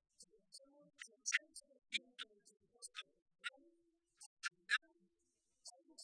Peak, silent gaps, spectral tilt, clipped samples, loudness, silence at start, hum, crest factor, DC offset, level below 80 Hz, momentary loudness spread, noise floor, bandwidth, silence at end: -20 dBFS; 3.22-3.26 s, 4.26-4.37 s; 2.5 dB/octave; under 0.1%; -45 LUFS; 0.2 s; none; 30 dB; under 0.1%; under -90 dBFS; 22 LU; -86 dBFS; 10.5 kHz; 0 s